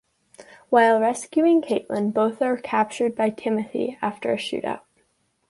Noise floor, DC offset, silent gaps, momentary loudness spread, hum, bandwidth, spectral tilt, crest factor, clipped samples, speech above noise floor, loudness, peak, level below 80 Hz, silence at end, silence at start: -68 dBFS; under 0.1%; none; 9 LU; none; 11.5 kHz; -5 dB/octave; 18 dB; under 0.1%; 46 dB; -22 LUFS; -6 dBFS; -68 dBFS; 0.7 s; 0.4 s